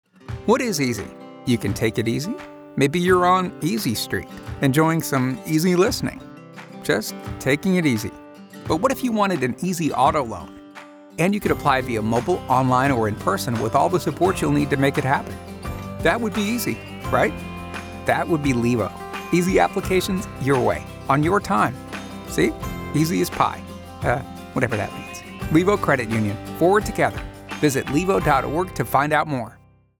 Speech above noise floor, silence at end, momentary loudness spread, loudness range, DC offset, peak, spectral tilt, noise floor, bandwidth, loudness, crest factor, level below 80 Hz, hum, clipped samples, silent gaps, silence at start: 22 dB; 0.45 s; 14 LU; 3 LU; under 0.1%; -4 dBFS; -5.5 dB/octave; -42 dBFS; over 20 kHz; -21 LUFS; 18 dB; -44 dBFS; none; under 0.1%; none; 0.3 s